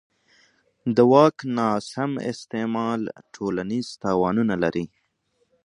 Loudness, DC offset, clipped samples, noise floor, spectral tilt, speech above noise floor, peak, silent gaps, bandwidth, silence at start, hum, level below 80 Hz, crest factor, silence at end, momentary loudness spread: -23 LUFS; under 0.1%; under 0.1%; -70 dBFS; -6.5 dB/octave; 48 dB; -2 dBFS; none; 10.5 kHz; 0.85 s; none; -60 dBFS; 22 dB; 0.8 s; 14 LU